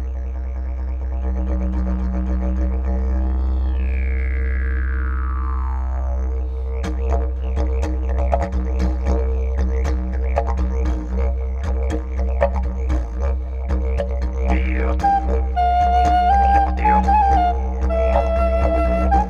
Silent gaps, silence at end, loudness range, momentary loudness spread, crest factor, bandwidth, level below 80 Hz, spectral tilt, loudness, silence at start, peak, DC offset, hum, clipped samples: none; 0 s; 6 LU; 8 LU; 16 dB; 6.8 kHz; -20 dBFS; -8 dB/octave; -21 LUFS; 0 s; -2 dBFS; under 0.1%; none; under 0.1%